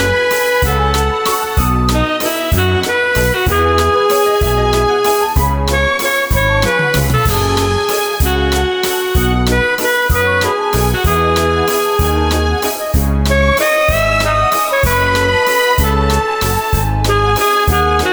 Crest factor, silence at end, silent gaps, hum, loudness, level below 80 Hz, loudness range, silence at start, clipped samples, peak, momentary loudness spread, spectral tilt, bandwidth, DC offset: 12 dB; 0 s; none; none; -13 LUFS; -20 dBFS; 1 LU; 0 s; under 0.1%; 0 dBFS; 3 LU; -4.5 dB/octave; over 20 kHz; under 0.1%